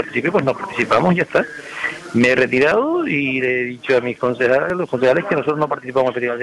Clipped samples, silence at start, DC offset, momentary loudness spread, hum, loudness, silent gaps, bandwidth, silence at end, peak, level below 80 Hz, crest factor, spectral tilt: under 0.1%; 0 s; under 0.1%; 7 LU; none; -18 LUFS; none; 11.5 kHz; 0 s; -4 dBFS; -54 dBFS; 12 dB; -6.5 dB/octave